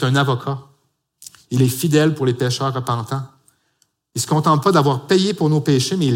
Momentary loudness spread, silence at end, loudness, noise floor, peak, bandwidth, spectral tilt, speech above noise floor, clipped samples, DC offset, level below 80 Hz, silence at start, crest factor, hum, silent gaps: 12 LU; 0 s; -18 LUFS; -65 dBFS; -2 dBFS; 17 kHz; -5.5 dB/octave; 48 dB; under 0.1%; under 0.1%; -60 dBFS; 0 s; 16 dB; none; none